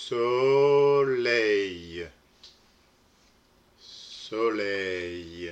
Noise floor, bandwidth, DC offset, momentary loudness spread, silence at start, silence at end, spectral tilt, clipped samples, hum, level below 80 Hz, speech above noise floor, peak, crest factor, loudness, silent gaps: -62 dBFS; 8.6 kHz; under 0.1%; 21 LU; 0 s; 0 s; -5 dB/octave; under 0.1%; none; -64 dBFS; 36 dB; -12 dBFS; 16 dB; -25 LUFS; none